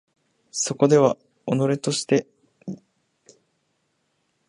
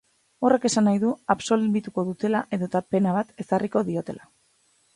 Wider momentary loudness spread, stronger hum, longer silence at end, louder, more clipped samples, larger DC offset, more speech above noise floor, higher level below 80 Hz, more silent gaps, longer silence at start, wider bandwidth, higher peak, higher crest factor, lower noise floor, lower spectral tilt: first, 21 LU vs 8 LU; neither; first, 1.75 s vs 0.8 s; about the same, -22 LUFS vs -24 LUFS; neither; neither; first, 51 dB vs 41 dB; second, -70 dBFS vs -64 dBFS; neither; first, 0.55 s vs 0.4 s; about the same, 11.5 kHz vs 11.5 kHz; about the same, -4 dBFS vs -4 dBFS; about the same, 22 dB vs 20 dB; first, -72 dBFS vs -65 dBFS; about the same, -5 dB/octave vs -6 dB/octave